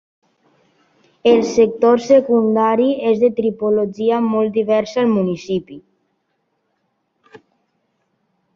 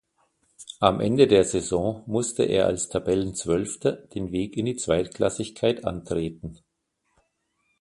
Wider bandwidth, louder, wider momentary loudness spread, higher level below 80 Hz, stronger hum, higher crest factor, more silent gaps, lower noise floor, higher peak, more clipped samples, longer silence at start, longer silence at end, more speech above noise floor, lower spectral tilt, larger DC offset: second, 7.2 kHz vs 11.5 kHz; first, -16 LUFS vs -25 LUFS; second, 6 LU vs 10 LU; second, -60 dBFS vs -50 dBFS; neither; second, 16 dB vs 24 dB; neither; second, -69 dBFS vs -75 dBFS; about the same, -2 dBFS vs 0 dBFS; neither; first, 1.25 s vs 0.6 s; first, 2.75 s vs 1.25 s; about the same, 54 dB vs 51 dB; first, -6.5 dB/octave vs -5 dB/octave; neither